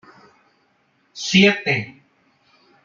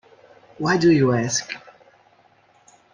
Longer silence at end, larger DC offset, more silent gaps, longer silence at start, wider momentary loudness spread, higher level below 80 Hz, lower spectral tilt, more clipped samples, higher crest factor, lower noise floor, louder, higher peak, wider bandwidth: second, 0.95 s vs 1.35 s; neither; neither; first, 1.15 s vs 0.6 s; first, 23 LU vs 17 LU; about the same, -60 dBFS vs -58 dBFS; about the same, -4.5 dB/octave vs -5 dB/octave; neither; first, 22 dB vs 16 dB; first, -63 dBFS vs -57 dBFS; about the same, -17 LUFS vs -19 LUFS; first, 0 dBFS vs -6 dBFS; second, 7.4 kHz vs 10.5 kHz